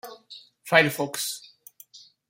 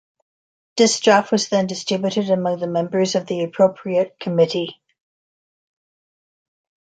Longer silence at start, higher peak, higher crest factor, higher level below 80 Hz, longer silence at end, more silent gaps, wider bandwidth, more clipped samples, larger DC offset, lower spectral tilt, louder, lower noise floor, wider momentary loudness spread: second, 0.05 s vs 0.75 s; about the same, -2 dBFS vs -2 dBFS; first, 26 dB vs 18 dB; about the same, -72 dBFS vs -68 dBFS; second, 0.3 s vs 2.1 s; neither; first, 16.5 kHz vs 9.4 kHz; neither; neither; second, -3 dB/octave vs -4.5 dB/octave; second, -23 LUFS vs -19 LUFS; second, -52 dBFS vs under -90 dBFS; first, 24 LU vs 7 LU